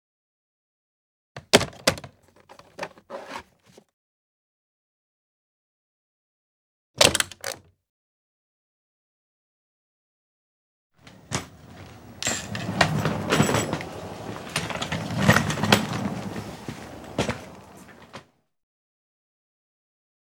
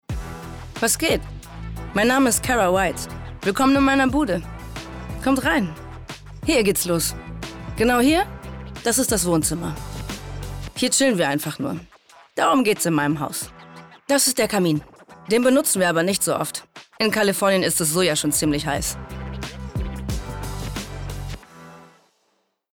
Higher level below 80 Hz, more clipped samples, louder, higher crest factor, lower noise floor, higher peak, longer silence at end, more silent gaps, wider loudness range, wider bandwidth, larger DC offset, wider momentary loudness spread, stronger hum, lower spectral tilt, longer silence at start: second, -52 dBFS vs -38 dBFS; neither; second, -24 LUFS vs -21 LUFS; first, 30 dB vs 14 dB; second, -56 dBFS vs -69 dBFS; first, 0 dBFS vs -8 dBFS; first, 2.05 s vs 0.85 s; first, 3.93-6.94 s, 7.89-10.90 s vs none; first, 17 LU vs 4 LU; about the same, over 20 kHz vs 19 kHz; neither; first, 25 LU vs 17 LU; neither; about the same, -3.5 dB/octave vs -3.5 dB/octave; first, 1.35 s vs 0.1 s